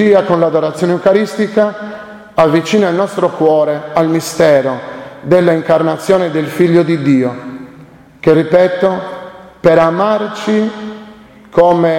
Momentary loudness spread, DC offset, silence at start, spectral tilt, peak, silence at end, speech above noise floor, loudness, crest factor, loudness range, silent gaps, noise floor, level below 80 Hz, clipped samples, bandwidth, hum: 17 LU; under 0.1%; 0 s; -6.5 dB/octave; 0 dBFS; 0 s; 27 dB; -12 LUFS; 12 dB; 1 LU; none; -38 dBFS; -50 dBFS; under 0.1%; 16.5 kHz; none